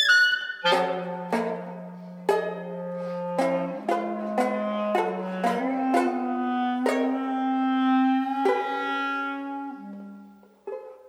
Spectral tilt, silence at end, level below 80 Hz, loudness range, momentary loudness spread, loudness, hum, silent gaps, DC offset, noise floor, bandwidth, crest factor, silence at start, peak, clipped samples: -4.5 dB/octave; 0 s; -82 dBFS; 4 LU; 15 LU; -26 LUFS; none; none; under 0.1%; -50 dBFS; 15.5 kHz; 18 dB; 0 s; -8 dBFS; under 0.1%